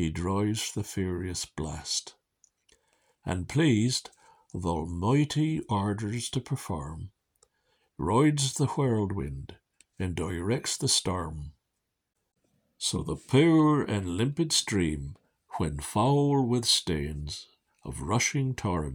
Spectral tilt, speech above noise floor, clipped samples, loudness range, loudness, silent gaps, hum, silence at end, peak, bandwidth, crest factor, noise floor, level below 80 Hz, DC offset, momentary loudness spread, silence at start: -4.5 dB/octave; 54 dB; under 0.1%; 5 LU; -28 LUFS; none; none; 0 s; -10 dBFS; 20 kHz; 20 dB; -82 dBFS; -48 dBFS; under 0.1%; 15 LU; 0 s